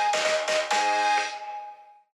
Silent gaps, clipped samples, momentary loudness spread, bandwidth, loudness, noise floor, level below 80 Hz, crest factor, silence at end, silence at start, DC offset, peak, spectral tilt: none; under 0.1%; 16 LU; 12.5 kHz; -24 LUFS; -45 dBFS; under -90 dBFS; 14 dB; 0.35 s; 0 s; under 0.1%; -12 dBFS; 0.5 dB/octave